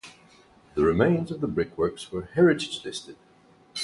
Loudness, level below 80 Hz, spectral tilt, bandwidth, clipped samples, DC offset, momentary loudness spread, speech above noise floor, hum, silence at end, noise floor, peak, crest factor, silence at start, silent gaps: -25 LUFS; -50 dBFS; -6 dB/octave; 11.5 kHz; under 0.1%; under 0.1%; 14 LU; 31 dB; none; 0 s; -56 dBFS; -6 dBFS; 20 dB; 0.05 s; none